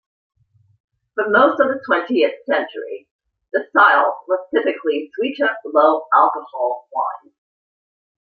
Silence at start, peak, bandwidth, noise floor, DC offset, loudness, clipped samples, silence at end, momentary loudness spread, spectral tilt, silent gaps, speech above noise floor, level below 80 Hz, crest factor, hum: 1.15 s; 0 dBFS; 4.8 kHz; under -90 dBFS; under 0.1%; -18 LUFS; under 0.1%; 1.2 s; 12 LU; -6.5 dB/octave; 3.11-3.19 s; over 72 dB; -72 dBFS; 18 dB; none